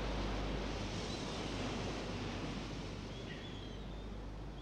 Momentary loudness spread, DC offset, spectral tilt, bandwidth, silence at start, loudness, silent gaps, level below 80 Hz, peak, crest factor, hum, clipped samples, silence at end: 7 LU; under 0.1%; -5 dB/octave; 10.5 kHz; 0 s; -43 LUFS; none; -48 dBFS; -28 dBFS; 14 dB; none; under 0.1%; 0 s